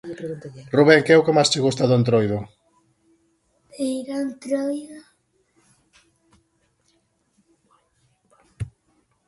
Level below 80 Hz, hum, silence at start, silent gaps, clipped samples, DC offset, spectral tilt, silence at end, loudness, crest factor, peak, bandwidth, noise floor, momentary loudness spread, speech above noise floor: -56 dBFS; none; 0.05 s; none; under 0.1%; under 0.1%; -5 dB/octave; 0.6 s; -20 LUFS; 22 dB; 0 dBFS; 11.5 kHz; -66 dBFS; 21 LU; 47 dB